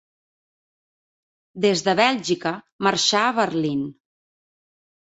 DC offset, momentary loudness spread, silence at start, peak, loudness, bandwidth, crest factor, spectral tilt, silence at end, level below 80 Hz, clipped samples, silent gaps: under 0.1%; 9 LU; 1.55 s; -4 dBFS; -21 LUFS; 8.2 kHz; 22 dB; -3.5 dB/octave; 1.2 s; -66 dBFS; under 0.1%; 2.72-2.79 s